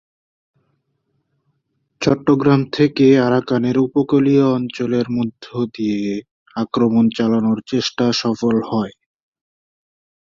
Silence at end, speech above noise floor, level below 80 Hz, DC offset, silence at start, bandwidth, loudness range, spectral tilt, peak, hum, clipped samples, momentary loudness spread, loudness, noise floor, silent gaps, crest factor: 1.45 s; 53 dB; -56 dBFS; under 0.1%; 2 s; 7.4 kHz; 4 LU; -6.5 dB/octave; -2 dBFS; none; under 0.1%; 11 LU; -17 LUFS; -69 dBFS; 6.31-6.46 s; 16 dB